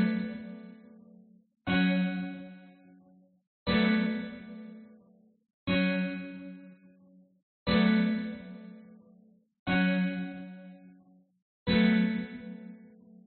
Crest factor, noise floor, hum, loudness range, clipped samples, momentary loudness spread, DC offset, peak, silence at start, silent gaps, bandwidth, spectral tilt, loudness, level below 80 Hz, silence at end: 18 dB; -62 dBFS; none; 4 LU; under 0.1%; 23 LU; under 0.1%; -14 dBFS; 0 s; 3.47-3.66 s, 5.54-5.66 s, 7.43-7.66 s, 9.59-9.66 s, 11.42-11.66 s; 4.5 kHz; -5 dB/octave; -30 LUFS; -58 dBFS; 0.4 s